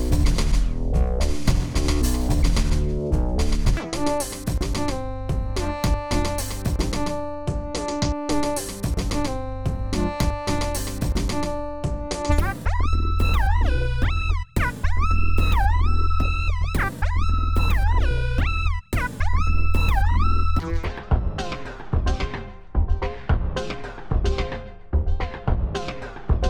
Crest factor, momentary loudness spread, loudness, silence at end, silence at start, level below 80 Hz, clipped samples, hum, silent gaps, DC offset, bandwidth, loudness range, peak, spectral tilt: 16 dB; 7 LU; -25 LUFS; 0 s; 0 s; -24 dBFS; under 0.1%; none; none; under 0.1%; 19 kHz; 4 LU; -6 dBFS; -5.5 dB/octave